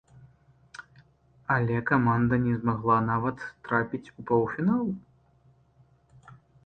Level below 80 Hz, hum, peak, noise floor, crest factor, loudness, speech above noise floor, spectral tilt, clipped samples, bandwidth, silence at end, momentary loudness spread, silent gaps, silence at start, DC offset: -56 dBFS; none; -10 dBFS; -62 dBFS; 18 dB; -27 LUFS; 36 dB; -9.5 dB/octave; under 0.1%; 6.4 kHz; 0.35 s; 18 LU; none; 0.8 s; under 0.1%